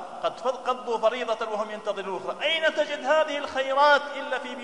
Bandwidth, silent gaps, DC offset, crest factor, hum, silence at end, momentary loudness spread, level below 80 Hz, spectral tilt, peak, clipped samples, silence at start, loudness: 11 kHz; none; 0.2%; 18 dB; none; 0 s; 11 LU; -74 dBFS; -2.5 dB/octave; -8 dBFS; under 0.1%; 0 s; -26 LUFS